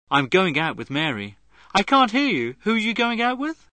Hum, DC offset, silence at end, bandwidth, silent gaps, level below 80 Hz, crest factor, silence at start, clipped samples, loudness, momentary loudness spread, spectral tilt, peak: none; 0.1%; 0.2 s; 9.2 kHz; none; -56 dBFS; 18 dB; 0.1 s; under 0.1%; -21 LUFS; 8 LU; -5 dB/octave; -4 dBFS